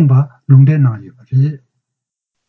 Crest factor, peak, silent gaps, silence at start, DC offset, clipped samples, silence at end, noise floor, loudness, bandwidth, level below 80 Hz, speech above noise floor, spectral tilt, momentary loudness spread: 12 dB; 0 dBFS; none; 0 s; under 0.1%; under 0.1%; 0.9 s; -80 dBFS; -12 LUFS; 2.9 kHz; -54 dBFS; 69 dB; -12 dB/octave; 10 LU